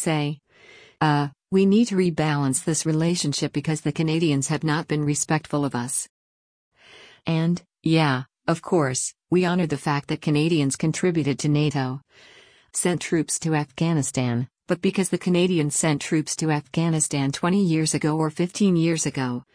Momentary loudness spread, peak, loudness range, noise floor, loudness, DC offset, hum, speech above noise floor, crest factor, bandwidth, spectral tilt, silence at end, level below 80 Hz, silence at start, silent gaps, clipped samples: 6 LU; -8 dBFS; 3 LU; -51 dBFS; -23 LUFS; under 0.1%; none; 28 dB; 16 dB; 10.5 kHz; -5 dB/octave; 0.15 s; -60 dBFS; 0 s; 6.09-6.71 s; under 0.1%